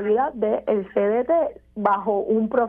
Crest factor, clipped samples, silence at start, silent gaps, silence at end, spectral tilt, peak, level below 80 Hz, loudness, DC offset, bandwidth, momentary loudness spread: 16 dB; under 0.1%; 0 s; none; 0 s; -10 dB/octave; -6 dBFS; -56 dBFS; -22 LUFS; under 0.1%; 3.6 kHz; 3 LU